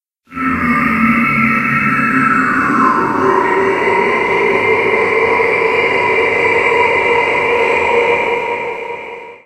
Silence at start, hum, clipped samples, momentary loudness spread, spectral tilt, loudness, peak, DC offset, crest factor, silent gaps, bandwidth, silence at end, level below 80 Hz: 0.3 s; none; under 0.1%; 6 LU; -5.5 dB/octave; -12 LUFS; 0 dBFS; under 0.1%; 14 dB; none; 14 kHz; 0.1 s; -46 dBFS